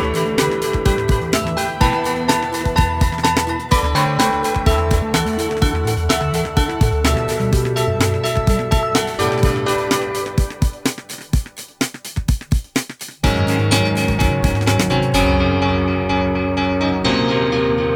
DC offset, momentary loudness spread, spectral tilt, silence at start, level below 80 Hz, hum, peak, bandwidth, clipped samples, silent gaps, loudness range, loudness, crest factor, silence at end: under 0.1%; 6 LU; -5 dB/octave; 0 s; -24 dBFS; none; 0 dBFS; over 20 kHz; under 0.1%; none; 4 LU; -18 LUFS; 16 dB; 0 s